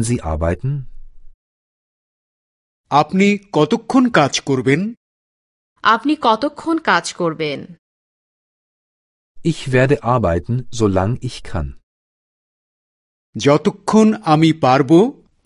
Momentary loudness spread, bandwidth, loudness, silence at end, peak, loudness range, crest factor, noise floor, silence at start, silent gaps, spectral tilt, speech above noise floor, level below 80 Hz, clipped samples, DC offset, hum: 11 LU; 11.5 kHz; -16 LUFS; 0.35 s; 0 dBFS; 5 LU; 18 dB; under -90 dBFS; 0 s; 1.34-2.84 s, 4.97-5.76 s, 7.79-9.35 s, 11.83-13.33 s; -6 dB/octave; over 74 dB; -38 dBFS; under 0.1%; under 0.1%; none